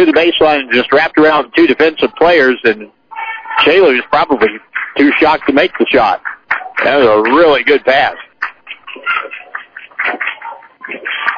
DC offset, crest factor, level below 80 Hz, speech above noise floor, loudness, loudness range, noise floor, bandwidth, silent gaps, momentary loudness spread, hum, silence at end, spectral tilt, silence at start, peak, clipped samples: under 0.1%; 12 dB; -46 dBFS; 20 dB; -11 LUFS; 4 LU; -30 dBFS; 5.4 kHz; none; 16 LU; none; 0 s; -6 dB/octave; 0 s; 0 dBFS; under 0.1%